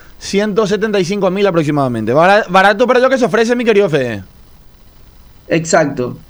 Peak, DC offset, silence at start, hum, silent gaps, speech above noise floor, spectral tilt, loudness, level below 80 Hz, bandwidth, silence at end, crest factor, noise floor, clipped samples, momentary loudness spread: 0 dBFS; under 0.1%; 0.2 s; none; none; 28 dB; -5 dB/octave; -13 LUFS; -44 dBFS; over 20 kHz; 0.1 s; 14 dB; -41 dBFS; under 0.1%; 8 LU